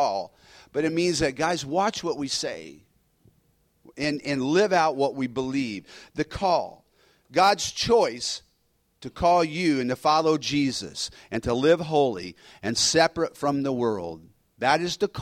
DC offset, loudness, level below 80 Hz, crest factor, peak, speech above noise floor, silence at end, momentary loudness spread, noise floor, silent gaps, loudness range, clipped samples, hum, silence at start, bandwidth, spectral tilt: under 0.1%; -25 LUFS; -54 dBFS; 20 dB; -6 dBFS; 45 dB; 0 s; 12 LU; -69 dBFS; none; 4 LU; under 0.1%; none; 0 s; 16 kHz; -4 dB/octave